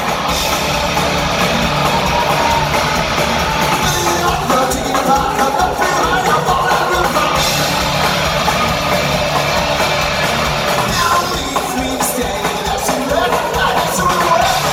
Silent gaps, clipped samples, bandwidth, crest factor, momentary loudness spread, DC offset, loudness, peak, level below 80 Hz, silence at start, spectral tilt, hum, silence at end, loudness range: none; under 0.1%; 16.5 kHz; 14 dB; 3 LU; under 0.1%; -14 LUFS; 0 dBFS; -32 dBFS; 0 s; -3.5 dB/octave; none; 0 s; 2 LU